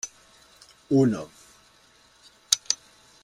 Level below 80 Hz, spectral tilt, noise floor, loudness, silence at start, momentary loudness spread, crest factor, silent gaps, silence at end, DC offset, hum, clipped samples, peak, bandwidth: -66 dBFS; -4 dB/octave; -58 dBFS; -25 LUFS; 0.05 s; 15 LU; 28 dB; none; 0.5 s; under 0.1%; none; under 0.1%; -2 dBFS; 16 kHz